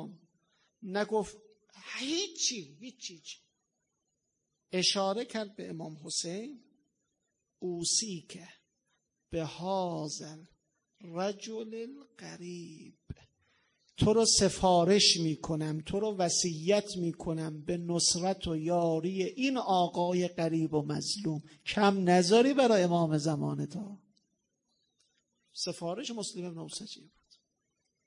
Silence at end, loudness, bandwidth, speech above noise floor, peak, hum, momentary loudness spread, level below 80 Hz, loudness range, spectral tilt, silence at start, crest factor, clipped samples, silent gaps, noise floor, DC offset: 1.1 s; -30 LUFS; 11 kHz; 52 dB; -10 dBFS; none; 22 LU; -60 dBFS; 13 LU; -4 dB/octave; 0 s; 22 dB; under 0.1%; none; -83 dBFS; under 0.1%